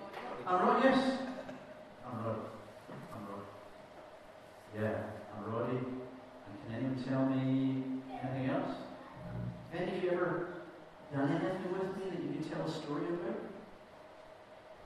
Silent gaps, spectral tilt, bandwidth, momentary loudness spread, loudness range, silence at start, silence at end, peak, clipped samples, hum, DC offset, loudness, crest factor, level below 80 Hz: none; -7.5 dB/octave; 12 kHz; 21 LU; 8 LU; 0 s; 0 s; -14 dBFS; under 0.1%; none; under 0.1%; -37 LUFS; 24 dB; -68 dBFS